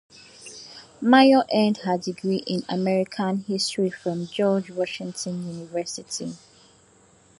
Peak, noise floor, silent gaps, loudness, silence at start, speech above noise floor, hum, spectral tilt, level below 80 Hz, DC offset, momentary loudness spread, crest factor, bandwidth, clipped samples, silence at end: -2 dBFS; -56 dBFS; none; -23 LUFS; 0.4 s; 33 dB; none; -5 dB/octave; -70 dBFS; under 0.1%; 22 LU; 22 dB; 11.5 kHz; under 0.1%; 1.05 s